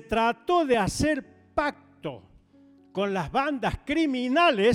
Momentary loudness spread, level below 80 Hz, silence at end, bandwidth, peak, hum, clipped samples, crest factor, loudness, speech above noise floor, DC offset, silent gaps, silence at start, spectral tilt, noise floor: 16 LU; -48 dBFS; 0 s; 16 kHz; -10 dBFS; none; under 0.1%; 16 dB; -26 LUFS; 32 dB; under 0.1%; none; 0.1 s; -5 dB/octave; -56 dBFS